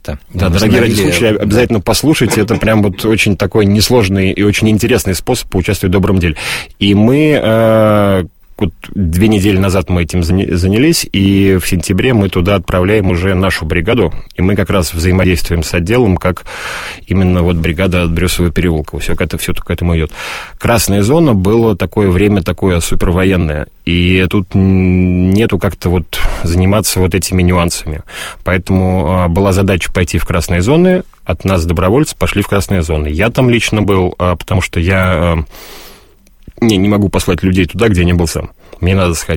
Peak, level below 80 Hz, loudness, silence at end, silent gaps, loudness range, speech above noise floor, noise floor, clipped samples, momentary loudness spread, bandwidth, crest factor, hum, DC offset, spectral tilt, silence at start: 0 dBFS; -24 dBFS; -12 LUFS; 0 s; none; 3 LU; 31 dB; -42 dBFS; under 0.1%; 8 LU; 16.5 kHz; 12 dB; none; under 0.1%; -5.5 dB/octave; 0.05 s